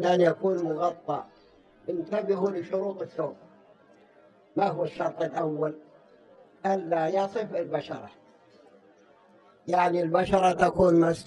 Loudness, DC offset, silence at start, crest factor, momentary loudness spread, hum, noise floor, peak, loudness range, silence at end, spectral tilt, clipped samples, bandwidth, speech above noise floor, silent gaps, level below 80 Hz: -27 LUFS; under 0.1%; 0 s; 20 dB; 13 LU; none; -58 dBFS; -8 dBFS; 5 LU; 0.05 s; -7 dB/octave; under 0.1%; 11 kHz; 32 dB; none; -58 dBFS